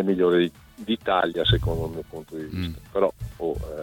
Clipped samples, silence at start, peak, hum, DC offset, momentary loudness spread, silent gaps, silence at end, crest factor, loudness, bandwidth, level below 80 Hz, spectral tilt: under 0.1%; 0 s; -8 dBFS; none; under 0.1%; 14 LU; none; 0 s; 18 dB; -25 LUFS; 18 kHz; -38 dBFS; -7 dB/octave